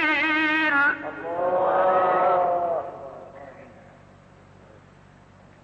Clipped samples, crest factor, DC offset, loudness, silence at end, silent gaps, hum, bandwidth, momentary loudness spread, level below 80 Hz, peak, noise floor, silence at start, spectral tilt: under 0.1%; 14 dB; under 0.1%; -22 LUFS; 1.85 s; none; none; 7.8 kHz; 21 LU; -62 dBFS; -12 dBFS; -51 dBFS; 0 s; -5.5 dB/octave